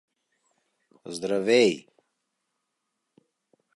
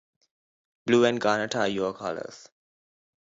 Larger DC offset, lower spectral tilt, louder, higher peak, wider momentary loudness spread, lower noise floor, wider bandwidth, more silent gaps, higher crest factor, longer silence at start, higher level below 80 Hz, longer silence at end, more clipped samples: neither; about the same, -4 dB/octave vs -4.5 dB/octave; about the same, -23 LUFS vs -25 LUFS; about the same, -8 dBFS vs -8 dBFS; about the same, 17 LU vs 15 LU; second, -81 dBFS vs under -90 dBFS; first, 11.5 kHz vs 7.8 kHz; neither; about the same, 22 dB vs 20 dB; first, 1.05 s vs 0.85 s; second, -76 dBFS vs -68 dBFS; first, 1.95 s vs 0.9 s; neither